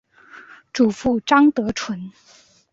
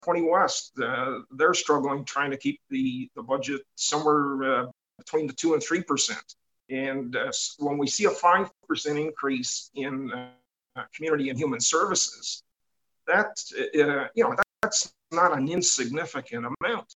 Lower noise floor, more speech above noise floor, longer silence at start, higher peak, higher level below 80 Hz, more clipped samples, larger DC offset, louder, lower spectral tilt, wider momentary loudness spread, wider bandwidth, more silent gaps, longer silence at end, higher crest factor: second, -45 dBFS vs -82 dBFS; second, 26 dB vs 56 dB; first, 0.35 s vs 0.05 s; first, -2 dBFS vs -8 dBFS; first, -52 dBFS vs -70 dBFS; neither; neither; first, -19 LUFS vs -26 LUFS; first, -5 dB/octave vs -2.5 dB/octave; first, 17 LU vs 11 LU; second, 7.8 kHz vs 10 kHz; neither; first, 0.6 s vs 0.05 s; about the same, 20 dB vs 20 dB